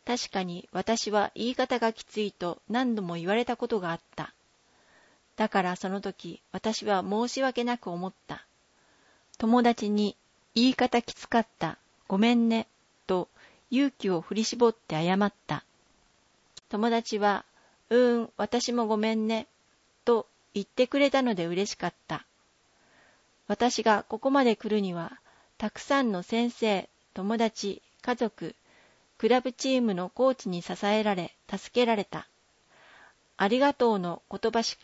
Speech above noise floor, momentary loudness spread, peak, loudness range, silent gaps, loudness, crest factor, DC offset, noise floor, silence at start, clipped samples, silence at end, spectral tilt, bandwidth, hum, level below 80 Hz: 39 dB; 13 LU; -10 dBFS; 4 LU; none; -28 LUFS; 18 dB; under 0.1%; -67 dBFS; 0.05 s; under 0.1%; 0.1 s; -5 dB/octave; 8 kHz; none; -66 dBFS